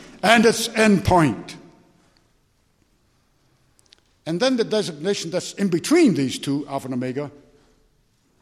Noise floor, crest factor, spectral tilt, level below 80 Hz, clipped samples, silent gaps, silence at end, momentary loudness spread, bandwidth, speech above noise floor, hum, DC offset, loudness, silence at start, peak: -63 dBFS; 22 dB; -5 dB/octave; -50 dBFS; under 0.1%; none; 1.15 s; 16 LU; 14.5 kHz; 44 dB; none; under 0.1%; -20 LUFS; 0 s; 0 dBFS